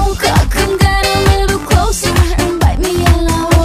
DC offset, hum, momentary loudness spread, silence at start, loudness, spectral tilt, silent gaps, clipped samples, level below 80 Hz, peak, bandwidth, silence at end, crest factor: under 0.1%; none; 2 LU; 0 s; -12 LUFS; -5 dB/octave; none; under 0.1%; -16 dBFS; 0 dBFS; 16 kHz; 0 s; 10 dB